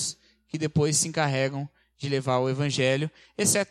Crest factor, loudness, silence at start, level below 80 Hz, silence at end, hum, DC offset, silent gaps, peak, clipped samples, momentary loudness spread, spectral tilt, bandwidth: 18 dB; -26 LUFS; 0 s; -62 dBFS; 0.05 s; none; under 0.1%; none; -8 dBFS; under 0.1%; 14 LU; -4 dB/octave; 15 kHz